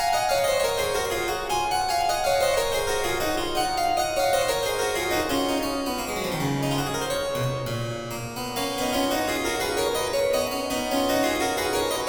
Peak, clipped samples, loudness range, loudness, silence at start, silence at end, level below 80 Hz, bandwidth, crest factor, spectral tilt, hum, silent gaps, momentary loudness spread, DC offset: -10 dBFS; under 0.1%; 3 LU; -25 LUFS; 0 s; 0 s; -44 dBFS; over 20 kHz; 14 dB; -3.5 dB/octave; none; none; 5 LU; under 0.1%